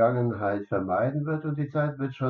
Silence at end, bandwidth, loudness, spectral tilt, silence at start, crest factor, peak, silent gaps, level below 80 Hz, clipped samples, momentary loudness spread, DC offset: 0 s; 4.4 kHz; -28 LUFS; -8.5 dB/octave; 0 s; 16 dB; -10 dBFS; none; -66 dBFS; under 0.1%; 4 LU; under 0.1%